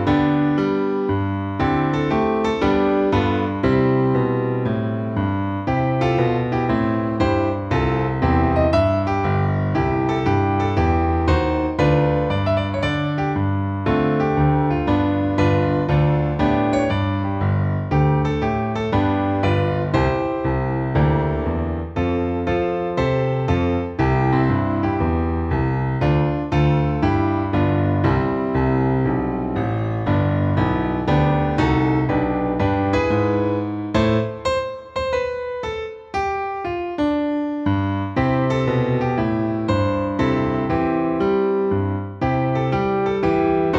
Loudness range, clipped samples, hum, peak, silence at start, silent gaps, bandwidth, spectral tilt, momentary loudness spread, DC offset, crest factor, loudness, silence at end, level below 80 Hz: 2 LU; under 0.1%; none; -4 dBFS; 0 s; none; 7.8 kHz; -8.5 dB/octave; 5 LU; under 0.1%; 16 dB; -20 LUFS; 0 s; -34 dBFS